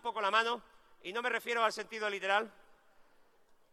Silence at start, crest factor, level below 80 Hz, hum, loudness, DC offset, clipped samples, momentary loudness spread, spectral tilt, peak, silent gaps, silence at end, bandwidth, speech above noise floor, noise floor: 0.05 s; 20 dB; -76 dBFS; none; -33 LUFS; under 0.1%; under 0.1%; 11 LU; -1.5 dB/octave; -16 dBFS; none; 0.7 s; 14.5 kHz; 31 dB; -65 dBFS